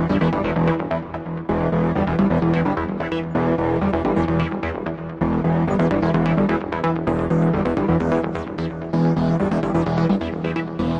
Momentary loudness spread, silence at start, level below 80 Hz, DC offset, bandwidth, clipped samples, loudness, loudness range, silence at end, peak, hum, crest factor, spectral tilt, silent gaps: 7 LU; 0 s; -40 dBFS; under 0.1%; 7.2 kHz; under 0.1%; -21 LUFS; 1 LU; 0 s; -6 dBFS; none; 14 dB; -9 dB/octave; none